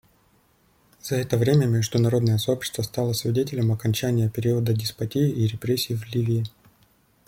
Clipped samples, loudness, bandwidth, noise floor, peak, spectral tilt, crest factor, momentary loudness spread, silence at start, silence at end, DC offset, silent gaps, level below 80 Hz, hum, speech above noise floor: under 0.1%; -24 LUFS; 16.5 kHz; -62 dBFS; -8 dBFS; -6 dB/octave; 16 dB; 7 LU; 1.05 s; 0.8 s; under 0.1%; none; -56 dBFS; none; 39 dB